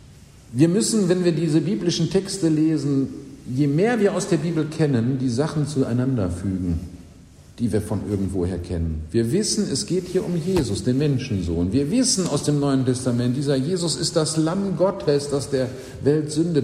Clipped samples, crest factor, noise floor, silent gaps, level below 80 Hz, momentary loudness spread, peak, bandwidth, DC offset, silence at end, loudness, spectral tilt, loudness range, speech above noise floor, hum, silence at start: under 0.1%; 18 dB; -46 dBFS; none; -44 dBFS; 6 LU; -4 dBFS; 15 kHz; under 0.1%; 0 s; -22 LUFS; -5.5 dB/octave; 4 LU; 25 dB; none; 0.1 s